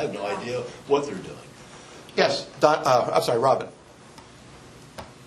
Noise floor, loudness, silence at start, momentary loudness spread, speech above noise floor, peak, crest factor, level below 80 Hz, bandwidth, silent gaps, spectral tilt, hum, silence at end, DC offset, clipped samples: -47 dBFS; -23 LUFS; 0 s; 22 LU; 24 dB; -2 dBFS; 24 dB; -60 dBFS; 13 kHz; none; -4.5 dB/octave; none; 0 s; under 0.1%; under 0.1%